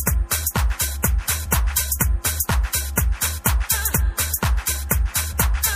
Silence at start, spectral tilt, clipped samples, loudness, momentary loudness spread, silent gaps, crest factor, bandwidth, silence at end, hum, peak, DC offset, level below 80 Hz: 0 s; -3 dB/octave; under 0.1%; -21 LUFS; 3 LU; none; 18 dB; 16 kHz; 0 s; none; -2 dBFS; under 0.1%; -24 dBFS